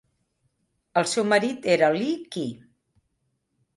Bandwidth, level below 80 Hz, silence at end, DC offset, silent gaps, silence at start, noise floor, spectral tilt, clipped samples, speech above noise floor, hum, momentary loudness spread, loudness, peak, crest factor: 11.5 kHz; -72 dBFS; 1.2 s; under 0.1%; none; 0.95 s; -75 dBFS; -4 dB/octave; under 0.1%; 52 dB; none; 12 LU; -24 LUFS; -6 dBFS; 20 dB